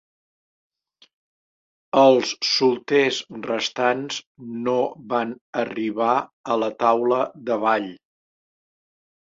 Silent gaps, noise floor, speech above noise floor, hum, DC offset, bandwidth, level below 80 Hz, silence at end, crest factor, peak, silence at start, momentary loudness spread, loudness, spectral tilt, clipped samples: 4.26-4.35 s, 5.41-5.53 s, 6.33-6.44 s; under -90 dBFS; over 68 dB; none; under 0.1%; 7.8 kHz; -70 dBFS; 1.3 s; 20 dB; -2 dBFS; 1.95 s; 11 LU; -22 LUFS; -4 dB/octave; under 0.1%